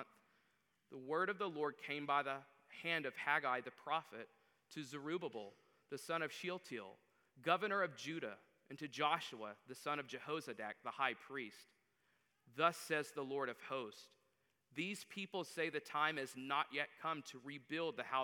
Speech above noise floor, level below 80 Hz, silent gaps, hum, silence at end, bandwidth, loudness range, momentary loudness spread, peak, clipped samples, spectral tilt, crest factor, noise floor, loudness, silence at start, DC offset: 39 dB; under -90 dBFS; none; none; 0 s; 19 kHz; 4 LU; 15 LU; -20 dBFS; under 0.1%; -4 dB/octave; 24 dB; -82 dBFS; -42 LUFS; 0 s; under 0.1%